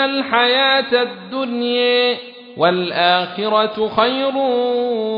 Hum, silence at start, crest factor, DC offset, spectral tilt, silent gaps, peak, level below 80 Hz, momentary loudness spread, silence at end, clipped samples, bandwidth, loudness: none; 0 s; 16 dB; under 0.1%; -6.5 dB/octave; none; 0 dBFS; -62 dBFS; 7 LU; 0 s; under 0.1%; 5.4 kHz; -17 LUFS